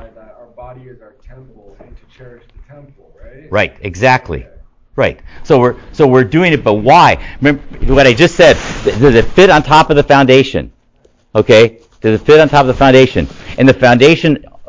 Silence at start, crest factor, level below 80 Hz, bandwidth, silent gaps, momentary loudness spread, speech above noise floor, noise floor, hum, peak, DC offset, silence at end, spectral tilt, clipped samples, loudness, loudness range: 0.05 s; 10 dB; -30 dBFS; 8 kHz; none; 11 LU; 41 dB; -51 dBFS; none; 0 dBFS; under 0.1%; 0.05 s; -6 dB/octave; 1%; -9 LUFS; 10 LU